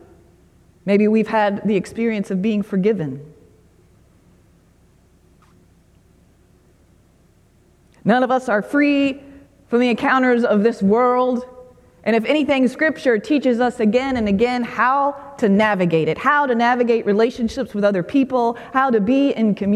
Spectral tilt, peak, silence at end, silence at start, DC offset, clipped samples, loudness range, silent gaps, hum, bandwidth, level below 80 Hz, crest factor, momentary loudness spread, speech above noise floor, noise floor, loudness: -7 dB/octave; -2 dBFS; 0 s; 0.85 s; under 0.1%; under 0.1%; 7 LU; none; none; 11.5 kHz; -52 dBFS; 16 dB; 6 LU; 37 dB; -54 dBFS; -18 LUFS